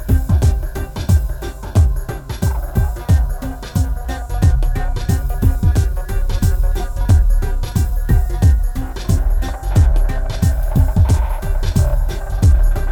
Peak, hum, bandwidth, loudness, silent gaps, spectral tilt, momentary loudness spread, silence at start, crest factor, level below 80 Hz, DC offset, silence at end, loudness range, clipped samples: -2 dBFS; none; 18.5 kHz; -18 LUFS; none; -7 dB/octave; 8 LU; 0 s; 12 dB; -16 dBFS; under 0.1%; 0 s; 2 LU; under 0.1%